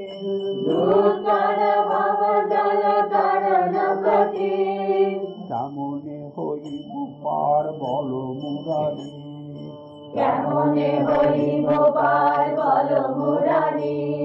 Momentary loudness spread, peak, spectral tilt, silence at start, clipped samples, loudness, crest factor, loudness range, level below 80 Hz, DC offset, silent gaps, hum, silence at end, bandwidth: 13 LU; -6 dBFS; -9 dB/octave; 0 s; under 0.1%; -21 LUFS; 14 dB; 7 LU; -62 dBFS; under 0.1%; none; none; 0 s; 6.6 kHz